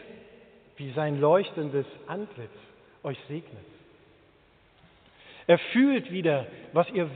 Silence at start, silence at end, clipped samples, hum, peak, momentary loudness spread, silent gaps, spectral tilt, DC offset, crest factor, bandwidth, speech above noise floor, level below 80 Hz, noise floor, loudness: 0 s; 0 s; under 0.1%; none; -6 dBFS; 19 LU; none; -5.5 dB/octave; under 0.1%; 22 dB; 4.5 kHz; 34 dB; -70 dBFS; -61 dBFS; -27 LUFS